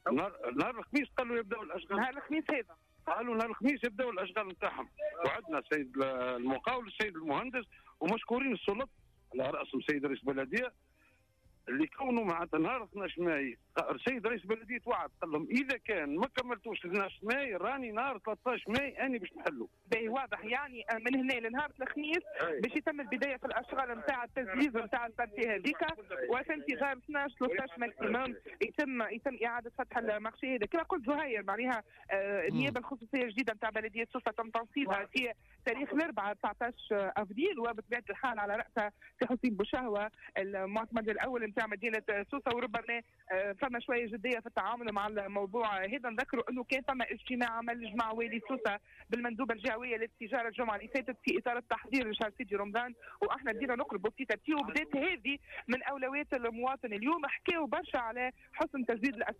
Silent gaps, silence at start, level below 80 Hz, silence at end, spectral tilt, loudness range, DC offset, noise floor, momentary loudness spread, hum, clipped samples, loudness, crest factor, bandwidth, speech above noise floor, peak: none; 0.05 s; -66 dBFS; 0.05 s; -5.5 dB/octave; 1 LU; under 0.1%; -70 dBFS; 5 LU; none; under 0.1%; -36 LUFS; 14 dB; 15 kHz; 34 dB; -22 dBFS